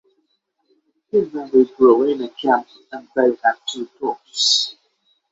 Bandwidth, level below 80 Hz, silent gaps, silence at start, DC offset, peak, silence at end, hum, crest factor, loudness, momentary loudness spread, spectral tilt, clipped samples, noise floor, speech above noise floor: 8 kHz; -64 dBFS; none; 1.15 s; under 0.1%; -2 dBFS; 0.6 s; none; 18 dB; -18 LUFS; 13 LU; -2.5 dB/octave; under 0.1%; -69 dBFS; 51 dB